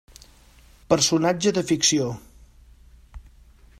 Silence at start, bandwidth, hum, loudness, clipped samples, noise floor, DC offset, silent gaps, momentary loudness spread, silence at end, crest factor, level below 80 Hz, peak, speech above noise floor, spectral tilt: 0.9 s; 14.5 kHz; none; -21 LUFS; under 0.1%; -52 dBFS; under 0.1%; none; 9 LU; 0.6 s; 22 dB; -50 dBFS; -4 dBFS; 31 dB; -3.5 dB/octave